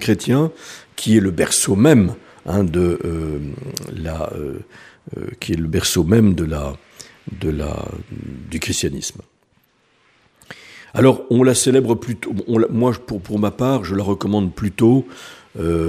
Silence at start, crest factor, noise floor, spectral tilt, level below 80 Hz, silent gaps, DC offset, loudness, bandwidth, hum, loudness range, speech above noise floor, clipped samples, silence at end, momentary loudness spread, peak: 0 s; 18 dB; -60 dBFS; -5.5 dB/octave; -38 dBFS; none; under 0.1%; -18 LUFS; 15.5 kHz; none; 9 LU; 42 dB; under 0.1%; 0 s; 18 LU; 0 dBFS